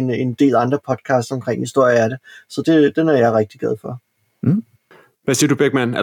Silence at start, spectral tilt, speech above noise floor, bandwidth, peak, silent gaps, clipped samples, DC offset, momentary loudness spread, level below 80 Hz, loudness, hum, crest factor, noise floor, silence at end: 0 s; -5.5 dB/octave; 34 dB; 18 kHz; -4 dBFS; none; under 0.1%; under 0.1%; 12 LU; -62 dBFS; -17 LUFS; none; 14 dB; -51 dBFS; 0 s